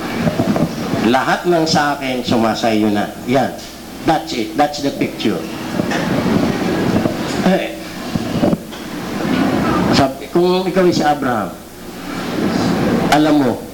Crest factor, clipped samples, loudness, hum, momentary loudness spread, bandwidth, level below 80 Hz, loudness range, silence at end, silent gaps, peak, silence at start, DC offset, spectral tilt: 12 dB; under 0.1%; -17 LUFS; none; 9 LU; 18 kHz; -42 dBFS; 2 LU; 0 s; none; -4 dBFS; 0 s; under 0.1%; -5.5 dB/octave